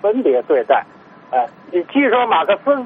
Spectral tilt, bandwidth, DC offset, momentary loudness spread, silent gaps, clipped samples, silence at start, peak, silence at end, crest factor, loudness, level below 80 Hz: -7 dB/octave; 4.4 kHz; under 0.1%; 7 LU; none; under 0.1%; 0.05 s; 0 dBFS; 0 s; 16 dB; -16 LUFS; -68 dBFS